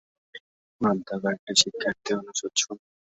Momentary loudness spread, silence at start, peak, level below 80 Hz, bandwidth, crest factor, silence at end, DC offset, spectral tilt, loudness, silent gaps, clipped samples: 9 LU; 0.35 s; -4 dBFS; -66 dBFS; 8.2 kHz; 26 dB; 0.3 s; under 0.1%; -2 dB/octave; -26 LUFS; 0.40-0.79 s, 1.39-1.47 s; under 0.1%